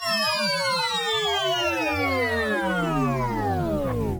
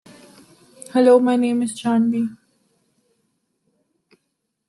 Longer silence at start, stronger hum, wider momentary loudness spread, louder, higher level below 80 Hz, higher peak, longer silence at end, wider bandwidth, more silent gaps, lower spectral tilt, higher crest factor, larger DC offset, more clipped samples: second, 0 s vs 0.95 s; neither; second, 3 LU vs 10 LU; second, -23 LUFS vs -18 LUFS; first, -42 dBFS vs -72 dBFS; second, -12 dBFS vs -4 dBFS; second, 0 s vs 2.35 s; first, over 20 kHz vs 12 kHz; neither; second, -4 dB/octave vs -5.5 dB/octave; second, 12 dB vs 18 dB; neither; neither